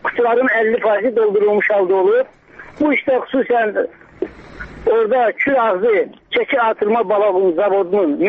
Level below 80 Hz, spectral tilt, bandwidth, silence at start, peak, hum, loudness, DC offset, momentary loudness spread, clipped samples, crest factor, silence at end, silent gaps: -50 dBFS; -7.5 dB/octave; 4.7 kHz; 0.05 s; -6 dBFS; none; -16 LUFS; under 0.1%; 10 LU; under 0.1%; 10 dB; 0 s; none